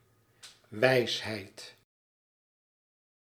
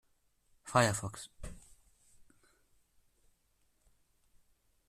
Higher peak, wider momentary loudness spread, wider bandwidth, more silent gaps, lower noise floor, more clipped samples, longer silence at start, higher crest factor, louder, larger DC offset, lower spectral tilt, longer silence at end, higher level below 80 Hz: first, -8 dBFS vs -14 dBFS; about the same, 22 LU vs 22 LU; first, 16 kHz vs 14 kHz; neither; second, -57 dBFS vs -74 dBFS; neither; second, 0.45 s vs 0.65 s; about the same, 26 dB vs 28 dB; first, -29 LUFS vs -32 LUFS; neither; about the same, -4.5 dB/octave vs -4 dB/octave; second, 1.55 s vs 3.3 s; second, -76 dBFS vs -62 dBFS